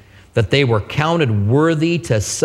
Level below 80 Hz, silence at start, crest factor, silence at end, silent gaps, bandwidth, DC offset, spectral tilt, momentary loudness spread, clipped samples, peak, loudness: -44 dBFS; 0.35 s; 16 dB; 0 s; none; 13.5 kHz; under 0.1%; -5.5 dB/octave; 4 LU; under 0.1%; 0 dBFS; -17 LUFS